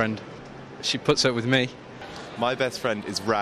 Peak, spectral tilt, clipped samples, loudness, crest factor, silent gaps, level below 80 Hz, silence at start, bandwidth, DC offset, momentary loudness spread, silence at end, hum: -8 dBFS; -4 dB/octave; under 0.1%; -25 LUFS; 20 dB; none; -58 dBFS; 0 s; 14 kHz; under 0.1%; 19 LU; 0 s; none